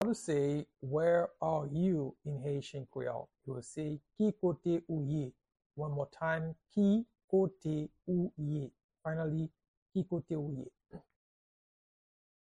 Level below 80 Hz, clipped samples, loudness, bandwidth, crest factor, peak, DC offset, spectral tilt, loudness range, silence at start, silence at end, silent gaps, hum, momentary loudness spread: -68 dBFS; under 0.1%; -36 LUFS; 10.5 kHz; 16 dB; -20 dBFS; under 0.1%; -8 dB/octave; 6 LU; 0 s; 1.5 s; 5.66-5.70 s, 7.24-7.28 s, 8.84-8.89 s, 9.68-9.86 s; none; 13 LU